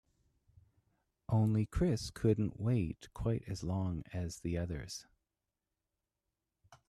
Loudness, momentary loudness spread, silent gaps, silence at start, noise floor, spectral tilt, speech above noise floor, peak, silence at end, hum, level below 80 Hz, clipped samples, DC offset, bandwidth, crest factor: -36 LUFS; 9 LU; none; 1.3 s; -89 dBFS; -7 dB/octave; 55 dB; -18 dBFS; 0.15 s; none; -54 dBFS; under 0.1%; under 0.1%; 13 kHz; 18 dB